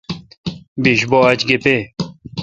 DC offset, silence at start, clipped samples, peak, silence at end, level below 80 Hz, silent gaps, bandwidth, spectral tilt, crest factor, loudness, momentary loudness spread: under 0.1%; 0.1 s; under 0.1%; 0 dBFS; 0 s; -48 dBFS; 0.37-0.44 s, 0.68-0.76 s; 8.4 kHz; -5.5 dB/octave; 18 dB; -14 LUFS; 16 LU